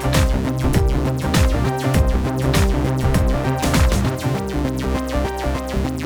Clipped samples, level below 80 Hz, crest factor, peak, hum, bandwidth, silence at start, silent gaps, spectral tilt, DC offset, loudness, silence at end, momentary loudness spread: under 0.1%; -22 dBFS; 14 dB; -2 dBFS; none; over 20 kHz; 0 s; none; -6 dB/octave; under 0.1%; -19 LUFS; 0 s; 5 LU